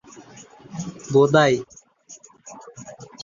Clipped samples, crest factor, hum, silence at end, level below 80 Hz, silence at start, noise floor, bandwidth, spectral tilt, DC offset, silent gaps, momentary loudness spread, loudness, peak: under 0.1%; 20 dB; none; 0 s; -60 dBFS; 0.2 s; -48 dBFS; 7.4 kHz; -5.5 dB/octave; under 0.1%; none; 26 LU; -19 LUFS; -2 dBFS